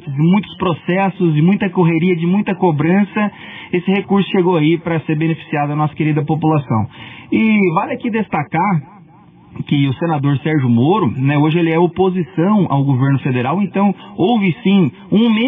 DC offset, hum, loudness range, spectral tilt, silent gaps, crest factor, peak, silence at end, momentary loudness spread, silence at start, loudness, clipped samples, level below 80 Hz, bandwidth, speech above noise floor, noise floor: under 0.1%; none; 3 LU; -11 dB/octave; none; 12 dB; -4 dBFS; 0 s; 6 LU; 0.05 s; -15 LUFS; under 0.1%; -56 dBFS; 3.8 kHz; 29 dB; -43 dBFS